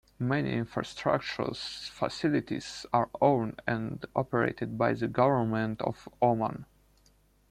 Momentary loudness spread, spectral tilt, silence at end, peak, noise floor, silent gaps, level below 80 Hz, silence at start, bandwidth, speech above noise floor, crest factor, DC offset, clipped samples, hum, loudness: 9 LU; -6.5 dB/octave; 0.85 s; -10 dBFS; -65 dBFS; none; -60 dBFS; 0.2 s; 13 kHz; 35 dB; 20 dB; under 0.1%; under 0.1%; none; -30 LUFS